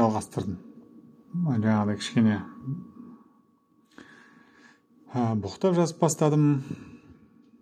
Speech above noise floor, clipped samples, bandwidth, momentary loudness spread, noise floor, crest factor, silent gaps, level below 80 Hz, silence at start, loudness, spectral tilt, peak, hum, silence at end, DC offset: 39 dB; under 0.1%; 13.5 kHz; 17 LU; -64 dBFS; 20 dB; none; -66 dBFS; 0 s; -26 LUFS; -6.5 dB/octave; -8 dBFS; none; 0.5 s; under 0.1%